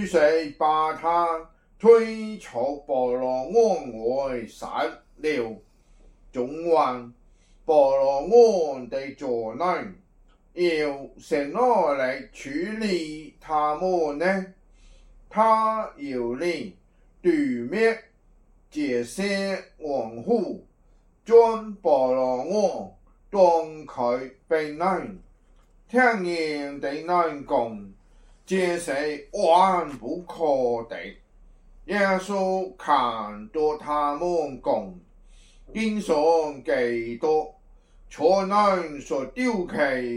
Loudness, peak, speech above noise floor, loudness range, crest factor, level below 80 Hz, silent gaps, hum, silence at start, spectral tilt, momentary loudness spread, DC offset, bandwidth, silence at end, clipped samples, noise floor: -24 LUFS; -4 dBFS; 35 dB; 5 LU; 20 dB; -54 dBFS; none; none; 0 s; -5.5 dB/octave; 14 LU; under 0.1%; 11.5 kHz; 0 s; under 0.1%; -58 dBFS